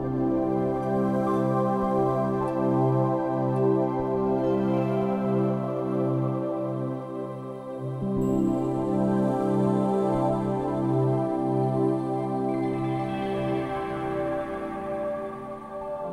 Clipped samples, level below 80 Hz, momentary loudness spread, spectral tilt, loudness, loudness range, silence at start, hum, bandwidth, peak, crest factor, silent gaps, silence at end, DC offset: under 0.1%; -52 dBFS; 8 LU; -9.5 dB/octave; -26 LUFS; 4 LU; 0 s; none; 10.5 kHz; -12 dBFS; 14 dB; none; 0 s; under 0.1%